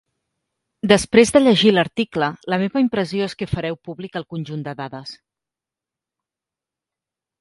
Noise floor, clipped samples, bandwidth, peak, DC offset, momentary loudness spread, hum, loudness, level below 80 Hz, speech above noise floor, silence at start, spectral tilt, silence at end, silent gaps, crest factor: -88 dBFS; under 0.1%; 11.5 kHz; 0 dBFS; under 0.1%; 17 LU; none; -18 LUFS; -50 dBFS; 69 dB; 0.85 s; -5 dB/octave; 2.25 s; none; 20 dB